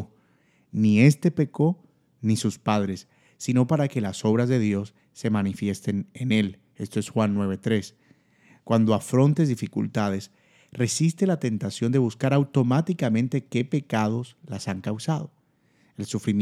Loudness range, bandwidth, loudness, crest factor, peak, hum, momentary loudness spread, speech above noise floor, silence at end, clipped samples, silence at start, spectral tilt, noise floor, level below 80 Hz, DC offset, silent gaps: 3 LU; 14 kHz; -25 LUFS; 20 dB; -4 dBFS; none; 11 LU; 40 dB; 0 s; under 0.1%; 0 s; -6.5 dB/octave; -64 dBFS; -68 dBFS; under 0.1%; none